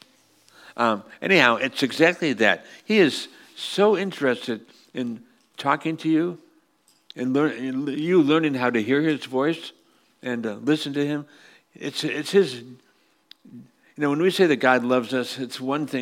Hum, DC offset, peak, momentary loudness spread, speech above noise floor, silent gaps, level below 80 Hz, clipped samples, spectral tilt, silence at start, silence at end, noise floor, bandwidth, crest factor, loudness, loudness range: none; under 0.1%; 0 dBFS; 13 LU; 41 dB; none; -76 dBFS; under 0.1%; -5 dB/octave; 0.65 s; 0 s; -63 dBFS; 16 kHz; 22 dB; -23 LUFS; 6 LU